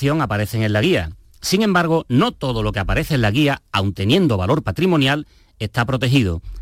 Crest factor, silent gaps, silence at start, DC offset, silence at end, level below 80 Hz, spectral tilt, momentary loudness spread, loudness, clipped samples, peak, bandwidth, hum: 14 dB; none; 0 s; under 0.1%; 0 s; -36 dBFS; -6 dB/octave; 6 LU; -18 LUFS; under 0.1%; -4 dBFS; 16.5 kHz; none